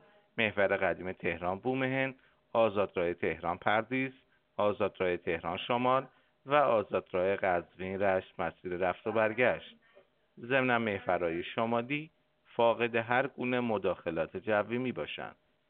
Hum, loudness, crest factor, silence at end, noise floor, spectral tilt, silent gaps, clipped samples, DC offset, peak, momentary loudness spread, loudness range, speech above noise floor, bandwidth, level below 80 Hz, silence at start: none; -32 LUFS; 22 dB; 0.35 s; -65 dBFS; -3.5 dB/octave; none; under 0.1%; under 0.1%; -10 dBFS; 9 LU; 1 LU; 33 dB; 4.3 kHz; -68 dBFS; 0.35 s